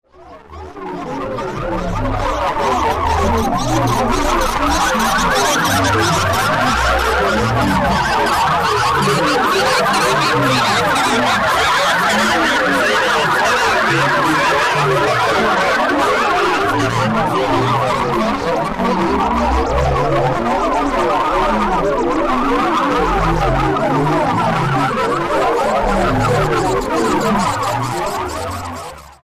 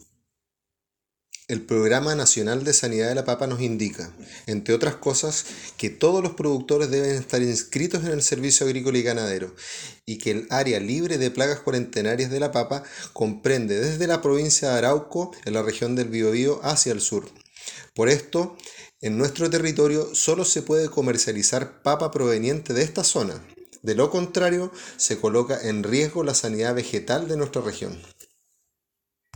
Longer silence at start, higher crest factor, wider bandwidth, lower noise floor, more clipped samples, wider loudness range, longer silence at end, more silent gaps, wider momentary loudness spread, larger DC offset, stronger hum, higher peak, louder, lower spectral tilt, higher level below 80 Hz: second, 0.2 s vs 1.35 s; second, 10 dB vs 22 dB; second, 15.5 kHz vs 19.5 kHz; second, -39 dBFS vs -86 dBFS; neither; about the same, 3 LU vs 3 LU; second, 0.2 s vs 1.3 s; neither; second, 6 LU vs 12 LU; neither; neither; second, -6 dBFS vs -2 dBFS; first, -15 LUFS vs -23 LUFS; about the same, -4.5 dB/octave vs -3.5 dB/octave; first, -30 dBFS vs -60 dBFS